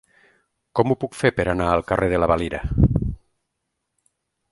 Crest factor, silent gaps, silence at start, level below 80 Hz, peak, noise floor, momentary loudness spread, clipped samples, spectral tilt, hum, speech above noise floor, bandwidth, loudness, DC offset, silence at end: 20 dB; none; 0.75 s; -34 dBFS; -2 dBFS; -78 dBFS; 7 LU; under 0.1%; -7.5 dB/octave; none; 57 dB; 11.5 kHz; -21 LUFS; under 0.1%; 1.35 s